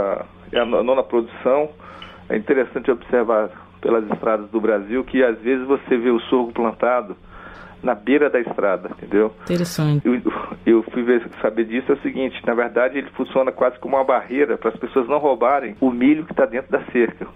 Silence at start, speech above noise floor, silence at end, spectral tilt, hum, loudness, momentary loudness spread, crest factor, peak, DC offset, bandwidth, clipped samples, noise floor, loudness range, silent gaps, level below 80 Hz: 0 s; 20 dB; 0.05 s; -7 dB/octave; none; -20 LUFS; 8 LU; 14 dB; -6 dBFS; under 0.1%; 15 kHz; under 0.1%; -39 dBFS; 2 LU; none; -52 dBFS